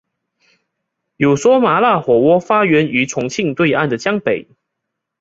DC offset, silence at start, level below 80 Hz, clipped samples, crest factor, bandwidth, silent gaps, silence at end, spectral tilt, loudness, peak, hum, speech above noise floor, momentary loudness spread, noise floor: under 0.1%; 1.2 s; -56 dBFS; under 0.1%; 14 dB; 7.8 kHz; none; 0.8 s; -5.5 dB/octave; -14 LUFS; -2 dBFS; none; 63 dB; 7 LU; -77 dBFS